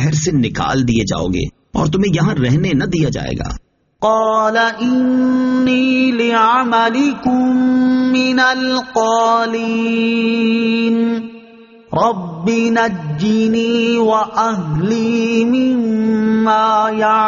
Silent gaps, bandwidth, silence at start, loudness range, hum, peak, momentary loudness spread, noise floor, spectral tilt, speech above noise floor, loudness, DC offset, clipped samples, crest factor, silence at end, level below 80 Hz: none; 7.4 kHz; 0 s; 3 LU; none; -2 dBFS; 6 LU; -41 dBFS; -5 dB/octave; 27 dB; -15 LUFS; under 0.1%; under 0.1%; 12 dB; 0 s; -40 dBFS